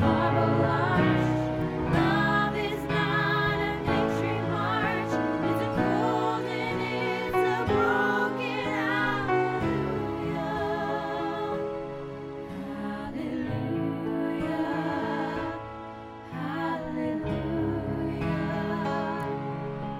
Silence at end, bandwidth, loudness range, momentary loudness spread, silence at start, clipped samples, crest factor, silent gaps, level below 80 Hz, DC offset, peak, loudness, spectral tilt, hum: 0 s; 16 kHz; 6 LU; 10 LU; 0 s; under 0.1%; 16 dB; none; -48 dBFS; under 0.1%; -10 dBFS; -28 LUFS; -7 dB/octave; none